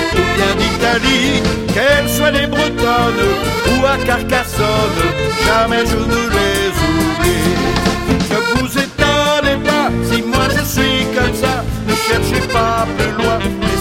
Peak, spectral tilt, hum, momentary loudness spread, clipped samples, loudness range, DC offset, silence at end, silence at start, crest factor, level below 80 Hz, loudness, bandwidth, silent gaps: 0 dBFS; -4.5 dB/octave; none; 4 LU; under 0.1%; 1 LU; under 0.1%; 0 s; 0 s; 14 dB; -26 dBFS; -14 LUFS; 16.5 kHz; none